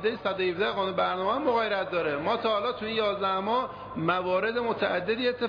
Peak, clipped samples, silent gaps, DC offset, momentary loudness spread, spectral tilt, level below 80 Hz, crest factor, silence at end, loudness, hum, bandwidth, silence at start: -14 dBFS; under 0.1%; none; under 0.1%; 3 LU; -7 dB/octave; -60 dBFS; 14 dB; 0 s; -28 LUFS; none; 5.2 kHz; 0 s